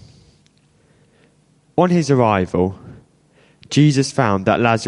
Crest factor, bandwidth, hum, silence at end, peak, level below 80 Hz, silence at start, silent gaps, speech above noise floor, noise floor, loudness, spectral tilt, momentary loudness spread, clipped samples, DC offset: 18 dB; 11.5 kHz; none; 0 s; 0 dBFS; -46 dBFS; 1.75 s; none; 41 dB; -56 dBFS; -17 LUFS; -6 dB/octave; 7 LU; under 0.1%; under 0.1%